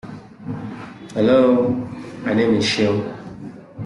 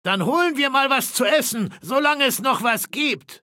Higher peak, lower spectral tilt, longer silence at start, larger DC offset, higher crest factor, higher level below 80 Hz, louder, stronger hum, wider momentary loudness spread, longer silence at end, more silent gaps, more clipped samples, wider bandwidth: about the same, -4 dBFS vs -6 dBFS; first, -6 dB/octave vs -3 dB/octave; about the same, 0.05 s vs 0.05 s; neither; about the same, 16 dB vs 16 dB; first, -54 dBFS vs -74 dBFS; about the same, -18 LUFS vs -20 LUFS; neither; first, 21 LU vs 5 LU; about the same, 0 s vs 0.05 s; neither; neither; second, 11.5 kHz vs 17 kHz